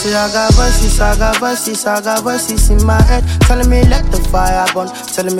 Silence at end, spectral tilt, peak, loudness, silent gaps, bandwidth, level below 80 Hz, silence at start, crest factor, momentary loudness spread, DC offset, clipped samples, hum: 0 s; -4.5 dB/octave; 0 dBFS; -13 LUFS; none; 17 kHz; -14 dBFS; 0 s; 10 dB; 5 LU; under 0.1%; under 0.1%; none